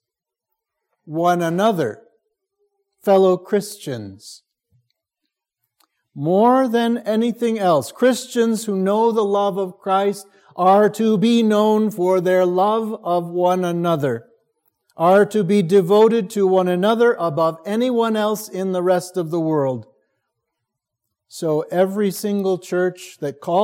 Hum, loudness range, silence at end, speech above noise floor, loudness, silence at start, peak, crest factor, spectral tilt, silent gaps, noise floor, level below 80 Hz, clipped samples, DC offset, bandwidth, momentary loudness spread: none; 6 LU; 0 s; 67 dB; -18 LUFS; 1.05 s; -2 dBFS; 16 dB; -6 dB/octave; none; -85 dBFS; -74 dBFS; under 0.1%; under 0.1%; 17 kHz; 10 LU